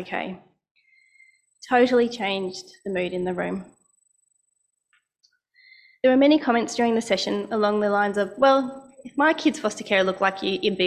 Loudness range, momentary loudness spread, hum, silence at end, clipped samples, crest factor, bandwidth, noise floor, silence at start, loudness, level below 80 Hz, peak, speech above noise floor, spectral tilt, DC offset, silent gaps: 10 LU; 14 LU; none; 0 s; under 0.1%; 18 dB; 11.5 kHz; -74 dBFS; 0 s; -22 LUFS; -64 dBFS; -6 dBFS; 52 dB; -4.5 dB/octave; under 0.1%; 0.71-0.75 s